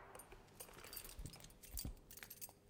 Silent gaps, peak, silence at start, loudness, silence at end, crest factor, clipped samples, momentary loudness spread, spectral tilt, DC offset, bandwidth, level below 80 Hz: none; -30 dBFS; 0 s; -54 LUFS; 0 s; 26 dB; under 0.1%; 9 LU; -3 dB/octave; under 0.1%; 18 kHz; -60 dBFS